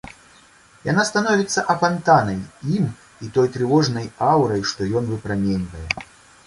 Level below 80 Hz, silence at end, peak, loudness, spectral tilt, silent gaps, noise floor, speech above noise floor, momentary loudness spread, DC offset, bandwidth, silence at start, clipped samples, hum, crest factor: -46 dBFS; 0.45 s; -2 dBFS; -20 LUFS; -5.5 dB/octave; none; -51 dBFS; 31 dB; 10 LU; under 0.1%; 11.5 kHz; 0.05 s; under 0.1%; none; 18 dB